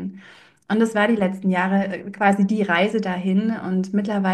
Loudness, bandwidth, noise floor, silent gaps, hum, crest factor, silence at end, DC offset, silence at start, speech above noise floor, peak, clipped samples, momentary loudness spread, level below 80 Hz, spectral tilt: -21 LUFS; 9.8 kHz; -48 dBFS; none; none; 16 dB; 0 s; under 0.1%; 0 s; 28 dB; -4 dBFS; under 0.1%; 5 LU; -66 dBFS; -7 dB/octave